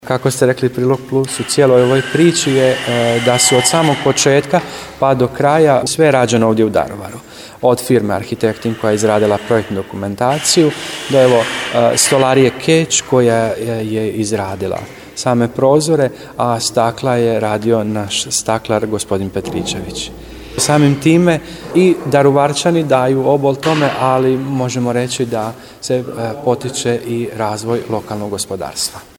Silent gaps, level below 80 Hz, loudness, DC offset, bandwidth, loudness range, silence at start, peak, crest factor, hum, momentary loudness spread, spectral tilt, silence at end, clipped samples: none; -46 dBFS; -14 LUFS; under 0.1%; 19.5 kHz; 5 LU; 0.05 s; 0 dBFS; 14 dB; none; 10 LU; -4.5 dB/octave; 0.15 s; under 0.1%